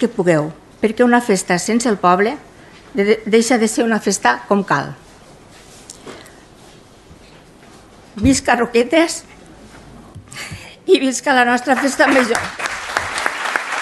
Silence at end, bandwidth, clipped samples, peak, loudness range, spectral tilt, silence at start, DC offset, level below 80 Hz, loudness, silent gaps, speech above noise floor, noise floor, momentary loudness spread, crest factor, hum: 0 s; 12.5 kHz; under 0.1%; 0 dBFS; 6 LU; -4 dB/octave; 0 s; under 0.1%; -44 dBFS; -16 LUFS; none; 28 dB; -43 dBFS; 17 LU; 18 dB; none